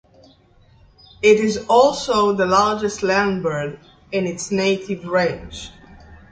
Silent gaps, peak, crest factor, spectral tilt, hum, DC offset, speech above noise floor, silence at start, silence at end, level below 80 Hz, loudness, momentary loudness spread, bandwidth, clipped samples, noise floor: none; -2 dBFS; 18 dB; -4.5 dB/octave; none; under 0.1%; 34 dB; 1.2 s; 0.15 s; -48 dBFS; -18 LUFS; 13 LU; 9.4 kHz; under 0.1%; -52 dBFS